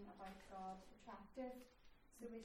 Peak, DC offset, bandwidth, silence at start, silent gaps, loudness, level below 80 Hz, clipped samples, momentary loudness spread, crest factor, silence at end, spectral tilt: -40 dBFS; under 0.1%; 16.5 kHz; 0 s; none; -56 LUFS; -72 dBFS; under 0.1%; 9 LU; 16 dB; 0 s; -5.5 dB/octave